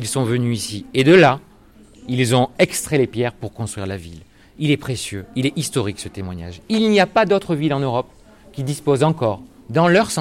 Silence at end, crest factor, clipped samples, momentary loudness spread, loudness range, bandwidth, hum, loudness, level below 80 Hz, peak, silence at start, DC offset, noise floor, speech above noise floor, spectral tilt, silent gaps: 0 s; 16 dB; under 0.1%; 15 LU; 6 LU; 16.5 kHz; none; -19 LUFS; -50 dBFS; -4 dBFS; 0 s; under 0.1%; -47 dBFS; 29 dB; -5.5 dB/octave; none